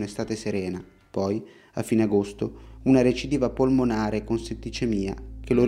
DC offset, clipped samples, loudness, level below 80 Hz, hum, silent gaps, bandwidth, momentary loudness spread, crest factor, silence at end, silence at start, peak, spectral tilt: under 0.1%; under 0.1%; -26 LUFS; -44 dBFS; none; none; 14 kHz; 12 LU; 18 dB; 0 s; 0 s; -8 dBFS; -6.5 dB/octave